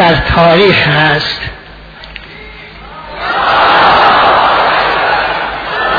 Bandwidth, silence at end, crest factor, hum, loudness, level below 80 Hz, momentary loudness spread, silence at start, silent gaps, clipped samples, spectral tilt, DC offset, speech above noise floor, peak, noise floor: 5.4 kHz; 0 s; 10 dB; none; -8 LUFS; -30 dBFS; 22 LU; 0 s; none; 0.2%; -6 dB/octave; under 0.1%; 23 dB; 0 dBFS; -31 dBFS